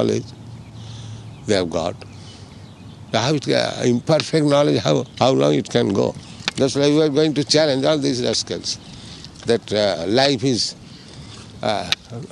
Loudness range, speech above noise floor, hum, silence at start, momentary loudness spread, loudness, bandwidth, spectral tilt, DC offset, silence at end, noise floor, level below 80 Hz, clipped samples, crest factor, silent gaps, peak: 5 LU; 21 dB; none; 0 s; 21 LU; -19 LUFS; 12 kHz; -5 dB/octave; under 0.1%; 0 s; -39 dBFS; -52 dBFS; under 0.1%; 20 dB; none; 0 dBFS